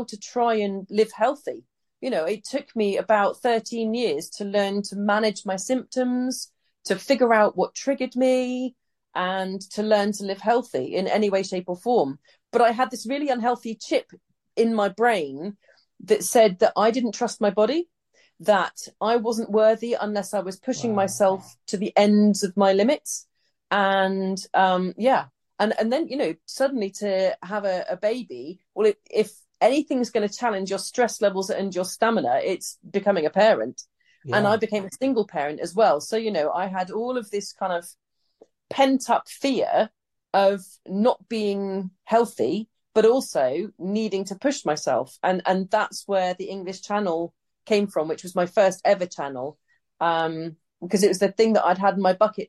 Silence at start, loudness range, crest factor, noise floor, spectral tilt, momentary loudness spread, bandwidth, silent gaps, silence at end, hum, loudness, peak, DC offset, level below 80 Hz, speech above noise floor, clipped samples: 0 s; 3 LU; 18 dB; -58 dBFS; -4.5 dB/octave; 10 LU; 12.5 kHz; none; 0.05 s; none; -23 LUFS; -6 dBFS; under 0.1%; -72 dBFS; 35 dB; under 0.1%